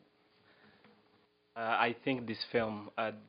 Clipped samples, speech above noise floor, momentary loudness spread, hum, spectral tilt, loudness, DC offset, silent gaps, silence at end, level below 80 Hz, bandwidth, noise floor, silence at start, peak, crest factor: under 0.1%; 35 dB; 8 LU; none; -2.5 dB/octave; -35 LUFS; under 0.1%; none; 0.05 s; -76 dBFS; 5.2 kHz; -70 dBFS; 1.55 s; -12 dBFS; 26 dB